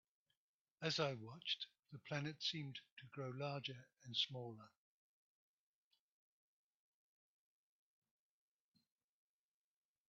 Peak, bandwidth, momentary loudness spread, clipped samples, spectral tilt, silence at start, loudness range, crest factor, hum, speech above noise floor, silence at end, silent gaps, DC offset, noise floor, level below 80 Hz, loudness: -26 dBFS; 7.4 kHz; 14 LU; under 0.1%; -3 dB/octave; 0.8 s; 5 LU; 26 dB; none; over 43 dB; 5.4 s; 2.92-2.97 s; under 0.1%; under -90 dBFS; -90 dBFS; -45 LUFS